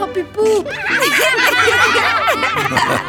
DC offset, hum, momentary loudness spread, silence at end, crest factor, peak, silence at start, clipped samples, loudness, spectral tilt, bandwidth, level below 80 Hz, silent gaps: under 0.1%; none; 6 LU; 0 s; 14 dB; -2 dBFS; 0 s; under 0.1%; -13 LUFS; -2.5 dB/octave; over 20 kHz; -48 dBFS; none